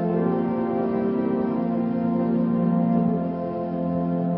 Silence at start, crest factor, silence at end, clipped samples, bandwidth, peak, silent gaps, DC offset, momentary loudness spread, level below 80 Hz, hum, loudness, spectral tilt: 0 s; 12 dB; 0 s; under 0.1%; 4.4 kHz; -10 dBFS; none; under 0.1%; 5 LU; -58 dBFS; none; -24 LUFS; -13.5 dB/octave